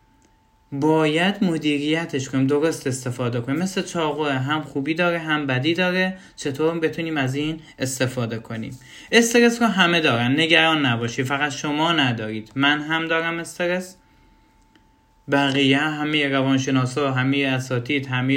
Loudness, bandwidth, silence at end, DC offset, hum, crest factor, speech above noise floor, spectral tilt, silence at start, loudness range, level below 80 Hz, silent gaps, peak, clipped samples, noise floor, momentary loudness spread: -21 LUFS; 16 kHz; 0 s; under 0.1%; none; 20 dB; 37 dB; -4.5 dB/octave; 0.7 s; 5 LU; -60 dBFS; none; 0 dBFS; under 0.1%; -58 dBFS; 11 LU